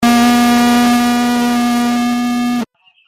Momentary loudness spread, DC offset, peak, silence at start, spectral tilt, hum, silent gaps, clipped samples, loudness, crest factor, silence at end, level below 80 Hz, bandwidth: 7 LU; under 0.1%; -2 dBFS; 0 s; -3.5 dB/octave; none; none; under 0.1%; -13 LUFS; 10 dB; 0.45 s; -44 dBFS; 16 kHz